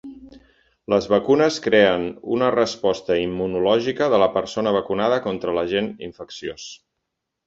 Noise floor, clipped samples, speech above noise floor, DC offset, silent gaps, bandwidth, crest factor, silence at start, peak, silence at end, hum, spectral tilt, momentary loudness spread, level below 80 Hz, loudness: -79 dBFS; under 0.1%; 59 dB; under 0.1%; none; 7.8 kHz; 20 dB; 0.05 s; -2 dBFS; 0.7 s; none; -5 dB/octave; 15 LU; -54 dBFS; -20 LUFS